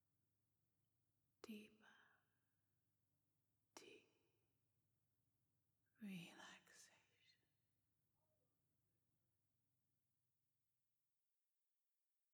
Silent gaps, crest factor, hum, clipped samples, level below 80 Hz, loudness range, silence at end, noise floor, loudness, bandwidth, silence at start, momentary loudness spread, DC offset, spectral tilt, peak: none; 30 dB; none; under 0.1%; under -90 dBFS; 4 LU; 5 s; under -90 dBFS; -62 LUFS; over 20 kHz; 1.45 s; 11 LU; under 0.1%; -4.5 dB/octave; -40 dBFS